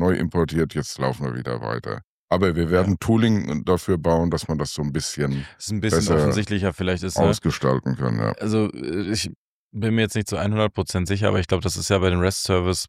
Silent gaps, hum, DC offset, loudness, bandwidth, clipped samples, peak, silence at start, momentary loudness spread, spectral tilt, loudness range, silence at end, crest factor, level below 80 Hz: 2.04-2.28 s, 9.36-9.71 s; none; under 0.1%; -22 LUFS; 15 kHz; under 0.1%; -4 dBFS; 0 s; 8 LU; -5.5 dB/octave; 2 LU; 0 s; 16 dB; -42 dBFS